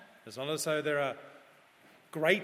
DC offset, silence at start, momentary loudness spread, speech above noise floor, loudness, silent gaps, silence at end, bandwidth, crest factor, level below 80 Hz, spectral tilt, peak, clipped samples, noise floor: under 0.1%; 0 s; 17 LU; 29 dB; -33 LUFS; none; 0 s; 16 kHz; 24 dB; -84 dBFS; -3.5 dB/octave; -12 dBFS; under 0.1%; -61 dBFS